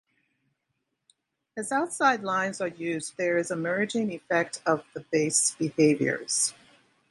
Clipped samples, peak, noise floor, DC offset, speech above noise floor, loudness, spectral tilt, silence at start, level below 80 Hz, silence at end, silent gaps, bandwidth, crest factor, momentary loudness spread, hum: under 0.1%; -8 dBFS; -80 dBFS; under 0.1%; 53 dB; -27 LUFS; -3.5 dB/octave; 1.55 s; -74 dBFS; 0.6 s; none; 11.5 kHz; 20 dB; 8 LU; none